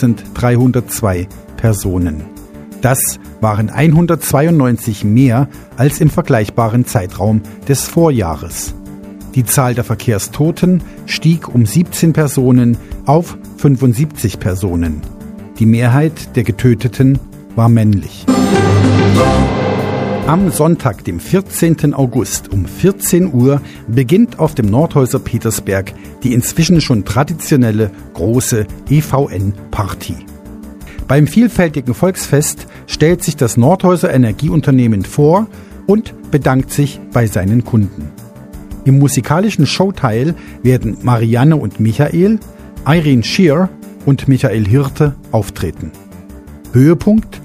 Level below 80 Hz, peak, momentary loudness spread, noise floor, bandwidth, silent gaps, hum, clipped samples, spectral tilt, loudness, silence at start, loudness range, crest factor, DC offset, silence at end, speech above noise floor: -32 dBFS; 0 dBFS; 10 LU; -33 dBFS; 15.5 kHz; none; none; under 0.1%; -6.5 dB/octave; -13 LUFS; 0 s; 3 LU; 12 dB; under 0.1%; 0 s; 21 dB